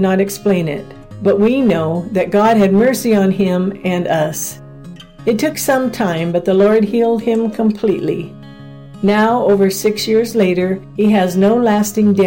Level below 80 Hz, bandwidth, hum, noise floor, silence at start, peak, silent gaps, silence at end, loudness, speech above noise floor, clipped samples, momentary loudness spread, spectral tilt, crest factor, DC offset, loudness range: -46 dBFS; 17 kHz; none; -35 dBFS; 0 s; -4 dBFS; none; 0 s; -14 LUFS; 21 dB; under 0.1%; 10 LU; -6 dB/octave; 10 dB; under 0.1%; 2 LU